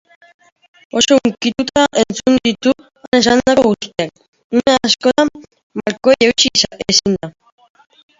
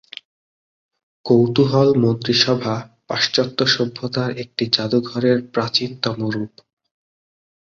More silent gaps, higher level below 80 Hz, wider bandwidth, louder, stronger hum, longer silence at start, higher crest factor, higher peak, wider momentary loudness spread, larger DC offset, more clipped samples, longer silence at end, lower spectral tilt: first, 3.08-3.12 s, 4.28-4.33 s, 4.44-4.50 s, 5.63-5.70 s vs none; first, -48 dBFS vs -58 dBFS; about the same, 7.8 kHz vs 7.4 kHz; first, -14 LUFS vs -18 LUFS; neither; second, 0.95 s vs 1.25 s; about the same, 16 dB vs 20 dB; about the same, 0 dBFS vs -2 dBFS; about the same, 11 LU vs 12 LU; neither; neither; second, 0.9 s vs 1.25 s; second, -3 dB/octave vs -5.5 dB/octave